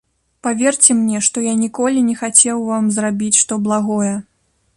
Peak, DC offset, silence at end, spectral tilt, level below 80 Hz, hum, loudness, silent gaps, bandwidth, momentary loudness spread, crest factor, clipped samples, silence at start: 0 dBFS; under 0.1%; 0.55 s; -3.5 dB/octave; -60 dBFS; none; -15 LUFS; none; 12 kHz; 8 LU; 16 dB; under 0.1%; 0.45 s